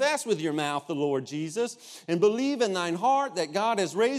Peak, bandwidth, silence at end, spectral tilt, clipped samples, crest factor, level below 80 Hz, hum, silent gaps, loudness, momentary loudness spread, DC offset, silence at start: -10 dBFS; 14.5 kHz; 0 s; -4.5 dB/octave; under 0.1%; 16 dB; -82 dBFS; none; none; -27 LUFS; 7 LU; under 0.1%; 0 s